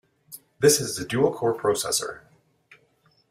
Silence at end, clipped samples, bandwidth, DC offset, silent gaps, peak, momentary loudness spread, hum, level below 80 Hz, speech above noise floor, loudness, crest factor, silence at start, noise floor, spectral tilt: 1.1 s; under 0.1%; 16 kHz; under 0.1%; none; -6 dBFS; 25 LU; none; -60 dBFS; 41 dB; -23 LUFS; 20 dB; 0.3 s; -64 dBFS; -3.5 dB/octave